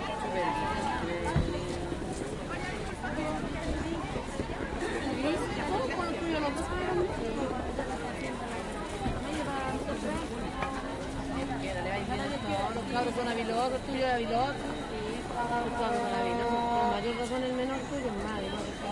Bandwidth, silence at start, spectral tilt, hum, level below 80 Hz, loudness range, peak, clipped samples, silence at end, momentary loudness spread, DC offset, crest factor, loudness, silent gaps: 11.5 kHz; 0 s; -5.5 dB/octave; none; -44 dBFS; 4 LU; -16 dBFS; under 0.1%; 0 s; 6 LU; under 0.1%; 16 dB; -33 LUFS; none